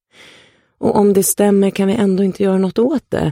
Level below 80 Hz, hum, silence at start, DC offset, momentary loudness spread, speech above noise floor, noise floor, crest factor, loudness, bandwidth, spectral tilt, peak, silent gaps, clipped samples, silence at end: -48 dBFS; none; 0.8 s; under 0.1%; 4 LU; 35 dB; -49 dBFS; 14 dB; -15 LUFS; 16.5 kHz; -6 dB/octave; -2 dBFS; none; under 0.1%; 0 s